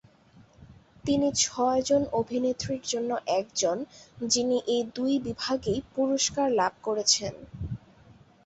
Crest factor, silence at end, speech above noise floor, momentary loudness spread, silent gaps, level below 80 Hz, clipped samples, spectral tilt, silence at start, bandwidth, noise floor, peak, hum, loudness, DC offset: 18 dB; 0.7 s; 30 dB; 14 LU; none; -54 dBFS; under 0.1%; -3 dB/octave; 0.6 s; 8.4 kHz; -57 dBFS; -10 dBFS; none; -27 LUFS; under 0.1%